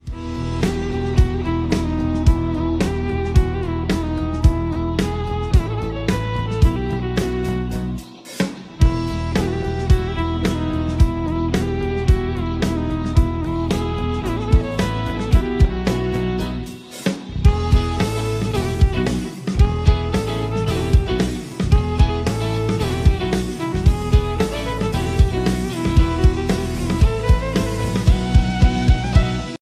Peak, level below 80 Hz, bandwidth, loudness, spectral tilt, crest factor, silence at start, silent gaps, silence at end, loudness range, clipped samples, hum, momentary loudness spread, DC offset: 0 dBFS; -22 dBFS; 14.5 kHz; -20 LUFS; -7 dB/octave; 18 dB; 0.05 s; none; 0.05 s; 3 LU; under 0.1%; none; 6 LU; under 0.1%